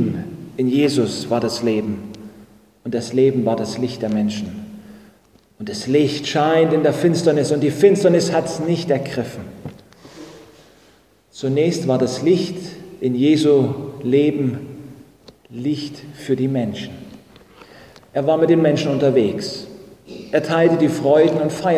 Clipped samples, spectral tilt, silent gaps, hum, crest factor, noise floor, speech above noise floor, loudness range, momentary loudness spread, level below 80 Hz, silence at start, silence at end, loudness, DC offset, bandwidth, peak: under 0.1%; -6 dB/octave; none; none; 18 dB; -53 dBFS; 36 dB; 8 LU; 20 LU; -54 dBFS; 0 s; 0 s; -18 LUFS; under 0.1%; 15 kHz; 0 dBFS